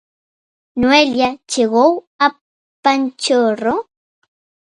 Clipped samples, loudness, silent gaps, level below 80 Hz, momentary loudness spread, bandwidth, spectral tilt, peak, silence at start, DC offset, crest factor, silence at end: under 0.1%; -15 LUFS; 2.07-2.19 s, 2.41-2.83 s; -52 dBFS; 7 LU; 11.5 kHz; -3 dB/octave; 0 dBFS; 0.75 s; under 0.1%; 18 dB; 0.85 s